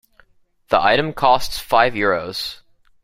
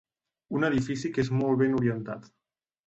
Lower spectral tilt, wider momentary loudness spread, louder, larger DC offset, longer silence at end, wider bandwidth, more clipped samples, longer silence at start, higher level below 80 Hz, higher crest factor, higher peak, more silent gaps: second, -4 dB/octave vs -7.5 dB/octave; about the same, 10 LU vs 11 LU; first, -18 LUFS vs -28 LUFS; neither; second, 0.5 s vs 0.65 s; first, 16 kHz vs 8.2 kHz; neither; first, 0.7 s vs 0.5 s; first, -44 dBFS vs -58 dBFS; about the same, 18 dB vs 16 dB; first, -2 dBFS vs -14 dBFS; neither